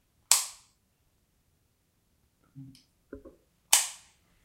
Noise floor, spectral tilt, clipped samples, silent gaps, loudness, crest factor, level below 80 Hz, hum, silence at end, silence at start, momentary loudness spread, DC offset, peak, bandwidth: -72 dBFS; 1.5 dB/octave; under 0.1%; none; -25 LUFS; 32 dB; -68 dBFS; none; 0.5 s; 0.3 s; 15 LU; under 0.1%; -2 dBFS; 16 kHz